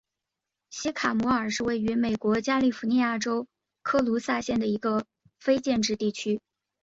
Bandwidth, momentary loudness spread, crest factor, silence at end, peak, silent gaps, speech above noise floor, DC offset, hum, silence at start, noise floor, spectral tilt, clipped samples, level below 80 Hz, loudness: 8 kHz; 8 LU; 18 dB; 0.45 s; -10 dBFS; none; 61 dB; under 0.1%; none; 0.7 s; -87 dBFS; -4.5 dB/octave; under 0.1%; -60 dBFS; -27 LUFS